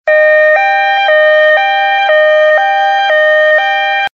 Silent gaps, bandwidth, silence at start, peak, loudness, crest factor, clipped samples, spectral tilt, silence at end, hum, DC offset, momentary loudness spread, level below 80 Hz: none; 6.8 kHz; 0.05 s; 0 dBFS; -8 LUFS; 8 dB; under 0.1%; 7 dB/octave; 0.05 s; none; under 0.1%; 3 LU; -72 dBFS